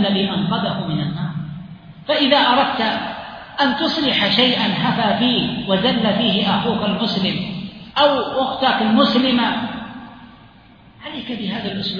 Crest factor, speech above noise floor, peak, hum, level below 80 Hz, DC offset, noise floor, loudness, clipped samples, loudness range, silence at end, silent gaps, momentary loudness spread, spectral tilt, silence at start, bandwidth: 18 dB; 28 dB; -2 dBFS; none; -52 dBFS; under 0.1%; -46 dBFS; -18 LUFS; under 0.1%; 3 LU; 0 s; none; 16 LU; -6.5 dB/octave; 0 s; 5.2 kHz